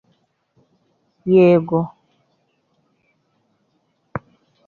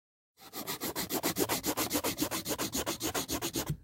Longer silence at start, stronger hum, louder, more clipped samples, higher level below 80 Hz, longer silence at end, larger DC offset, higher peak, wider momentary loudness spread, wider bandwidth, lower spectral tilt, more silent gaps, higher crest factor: first, 1.25 s vs 0.4 s; neither; first, -16 LUFS vs -33 LUFS; neither; about the same, -60 dBFS vs -56 dBFS; first, 0.5 s vs 0 s; neither; first, -4 dBFS vs -16 dBFS; first, 21 LU vs 5 LU; second, 4.5 kHz vs 17 kHz; first, -10 dB/octave vs -3 dB/octave; neither; about the same, 18 dB vs 20 dB